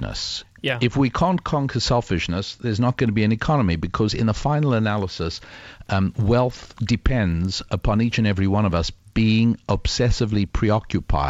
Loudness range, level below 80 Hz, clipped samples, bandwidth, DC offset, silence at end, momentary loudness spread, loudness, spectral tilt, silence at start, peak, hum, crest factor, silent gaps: 2 LU; -32 dBFS; under 0.1%; 8 kHz; under 0.1%; 0 s; 6 LU; -22 LUFS; -6 dB/octave; 0 s; -6 dBFS; none; 14 dB; none